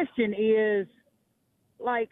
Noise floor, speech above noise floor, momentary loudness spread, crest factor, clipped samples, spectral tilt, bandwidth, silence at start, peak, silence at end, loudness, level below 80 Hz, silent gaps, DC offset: -72 dBFS; 46 dB; 11 LU; 14 dB; under 0.1%; -8.5 dB/octave; 3.9 kHz; 0 s; -14 dBFS; 0.05 s; -26 LUFS; -70 dBFS; none; under 0.1%